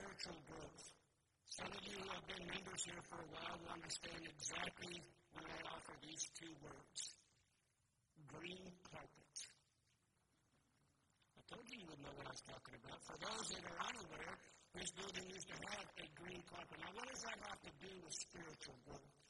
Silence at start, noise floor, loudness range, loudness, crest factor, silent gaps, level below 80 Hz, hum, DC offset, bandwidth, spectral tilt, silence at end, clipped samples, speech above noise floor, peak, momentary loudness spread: 0 s; -84 dBFS; 9 LU; -52 LUFS; 24 dB; none; -76 dBFS; none; under 0.1%; 11.5 kHz; -2 dB/octave; 0 s; under 0.1%; 30 dB; -32 dBFS; 11 LU